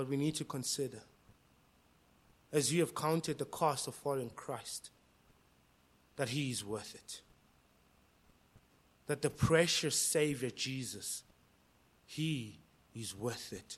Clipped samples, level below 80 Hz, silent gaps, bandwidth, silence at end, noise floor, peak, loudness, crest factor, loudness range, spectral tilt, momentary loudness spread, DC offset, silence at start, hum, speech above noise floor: under 0.1%; -66 dBFS; none; 16 kHz; 0 s; -69 dBFS; -14 dBFS; -36 LUFS; 24 dB; 9 LU; -4 dB/octave; 18 LU; under 0.1%; 0 s; none; 33 dB